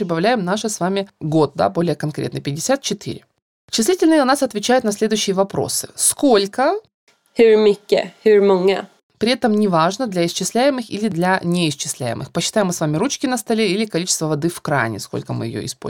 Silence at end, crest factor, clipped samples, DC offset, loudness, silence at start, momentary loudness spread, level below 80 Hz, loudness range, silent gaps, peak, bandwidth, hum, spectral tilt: 0 s; 16 dB; under 0.1%; under 0.1%; -18 LUFS; 0 s; 10 LU; -58 dBFS; 4 LU; 3.42-3.68 s, 6.94-7.07 s, 9.03-9.10 s; -2 dBFS; 18 kHz; none; -4.5 dB/octave